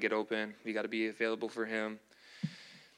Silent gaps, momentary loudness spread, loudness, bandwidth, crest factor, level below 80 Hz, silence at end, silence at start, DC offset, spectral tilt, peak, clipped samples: none; 13 LU; -37 LUFS; 11.5 kHz; 20 dB; -86 dBFS; 0.1 s; 0 s; under 0.1%; -5.5 dB/octave; -16 dBFS; under 0.1%